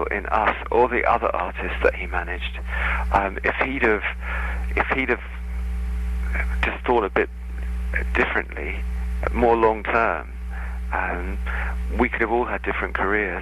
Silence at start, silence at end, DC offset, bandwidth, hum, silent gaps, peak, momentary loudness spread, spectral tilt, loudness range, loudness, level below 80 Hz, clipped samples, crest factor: 0 s; 0 s; under 0.1%; 12 kHz; none; none; -4 dBFS; 9 LU; -7 dB/octave; 2 LU; -23 LUFS; -28 dBFS; under 0.1%; 20 dB